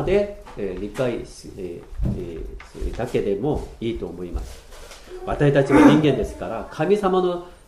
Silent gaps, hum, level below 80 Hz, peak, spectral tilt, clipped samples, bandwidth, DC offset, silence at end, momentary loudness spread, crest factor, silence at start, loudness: none; none; -36 dBFS; 0 dBFS; -7 dB/octave; under 0.1%; 13 kHz; under 0.1%; 0.15 s; 20 LU; 20 dB; 0 s; -21 LUFS